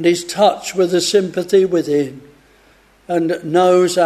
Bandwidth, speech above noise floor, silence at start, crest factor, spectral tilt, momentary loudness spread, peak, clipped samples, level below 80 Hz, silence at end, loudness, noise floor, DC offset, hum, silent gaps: 13.5 kHz; 36 dB; 0 s; 14 dB; -4.5 dB/octave; 7 LU; -2 dBFS; under 0.1%; -58 dBFS; 0 s; -16 LUFS; -51 dBFS; under 0.1%; none; none